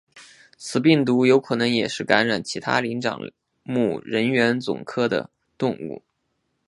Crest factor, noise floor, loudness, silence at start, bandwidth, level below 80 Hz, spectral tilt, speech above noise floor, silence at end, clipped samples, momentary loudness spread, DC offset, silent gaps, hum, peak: 22 dB; -73 dBFS; -22 LUFS; 0.15 s; 11.5 kHz; -64 dBFS; -5.5 dB/octave; 52 dB; 0.7 s; under 0.1%; 17 LU; under 0.1%; none; none; 0 dBFS